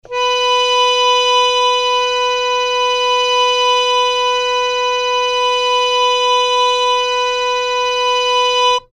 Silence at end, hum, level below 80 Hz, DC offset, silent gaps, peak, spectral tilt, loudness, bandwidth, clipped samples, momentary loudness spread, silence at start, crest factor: 0.15 s; none; -50 dBFS; under 0.1%; none; -4 dBFS; 2.5 dB/octave; -13 LUFS; 12.5 kHz; under 0.1%; 4 LU; 0.1 s; 12 dB